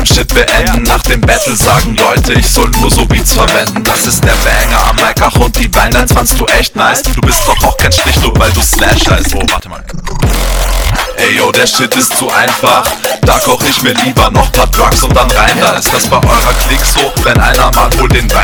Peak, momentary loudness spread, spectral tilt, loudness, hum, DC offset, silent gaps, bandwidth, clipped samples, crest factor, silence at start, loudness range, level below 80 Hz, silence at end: 0 dBFS; 4 LU; -3.5 dB/octave; -8 LUFS; none; under 0.1%; none; 20 kHz; 1%; 8 dB; 0 s; 2 LU; -14 dBFS; 0 s